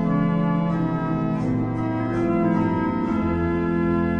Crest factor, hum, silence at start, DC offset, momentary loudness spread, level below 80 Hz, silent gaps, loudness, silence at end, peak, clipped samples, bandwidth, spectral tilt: 12 dB; none; 0 s; under 0.1%; 3 LU; -42 dBFS; none; -23 LUFS; 0 s; -10 dBFS; under 0.1%; 6.2 kHz; -9.5 dB/octave